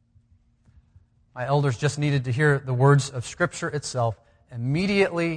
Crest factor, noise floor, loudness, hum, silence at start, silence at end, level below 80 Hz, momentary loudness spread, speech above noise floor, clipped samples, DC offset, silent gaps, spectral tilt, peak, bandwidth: 18 dB; -61 dBFS; -24 LUFS; none; 1.35 s; 0 s; -56 dBFS; 13 LU; 38 dB; under 0.1%; under 0.1%; none; -6 dB/octave; -8 dBFS; 10 kHz